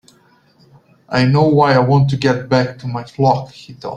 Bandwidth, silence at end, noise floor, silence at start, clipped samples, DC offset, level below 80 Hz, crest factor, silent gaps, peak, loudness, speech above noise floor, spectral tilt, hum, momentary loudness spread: 8.4 kHz; 0 s; -53 dBFS; 1.1 s; under 0.1%; under 0.1%; -50 dBFS; 14 dB; none; -2 dBFS; -15 LUFS; 38 dB; -7.5 dB/octave; none; 14 LU